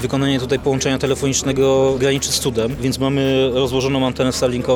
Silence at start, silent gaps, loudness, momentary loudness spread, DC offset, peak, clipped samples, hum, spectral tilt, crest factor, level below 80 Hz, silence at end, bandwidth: 0 s; none; -17 LUFS; 4 LU; under 0.1%; -4 dBFS; under 0.1%; none; -4.5 dB/octave; 12 dB; -38 dBFS; 0 s; 18.5 kHz